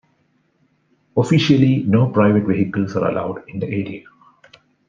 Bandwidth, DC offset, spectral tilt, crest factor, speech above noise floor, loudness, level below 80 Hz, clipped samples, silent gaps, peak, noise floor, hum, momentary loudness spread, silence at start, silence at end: 7.6 kHz; under 0.1%; -7.5 dB/octave; 16 dB; 46 dB; -18 LUFS; -58 dBFS; under 0.1%; none; -2 dBFS; -63 dBFS; none; 12 LU; 1.15 s; 0.9 s